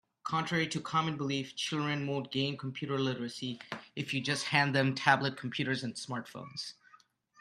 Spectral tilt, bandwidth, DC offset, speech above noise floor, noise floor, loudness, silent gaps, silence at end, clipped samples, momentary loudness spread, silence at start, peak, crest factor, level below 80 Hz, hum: -4.5 dB/octave; 13 kHz; under 0.1%; 31 dB; -64 dBFS; -33 LUFS; none; 0.7 s; under 0.1%; 13 LU; 0.25 s; -8 dBFS; 26 dB; -74 dBFS; none